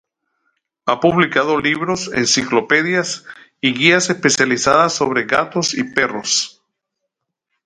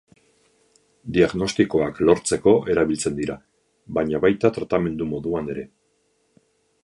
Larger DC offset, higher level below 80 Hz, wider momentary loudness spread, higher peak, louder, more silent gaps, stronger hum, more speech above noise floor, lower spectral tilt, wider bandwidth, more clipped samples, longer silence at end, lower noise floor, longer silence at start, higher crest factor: neither; second, -56 dBFS vs -48 dBFS; second, 7 LU vs 12 LU; about the same, 0 dBFS vs -2 dBFS; first, -16 LUFS vs -21 LUFS; neither; neither; first, 61 dB vs 46 dB; second, -3 dB/octave vs -5.5 dB/octave; about the same, 11 kHz vs 11.5 kHz; neither; about the same, 1.15 s vs 1.15 s; first, -77 dBFS vs -67 dBFS; second, 0.85 s vs 1.05 s; about the same, 18 dB vs 20 dB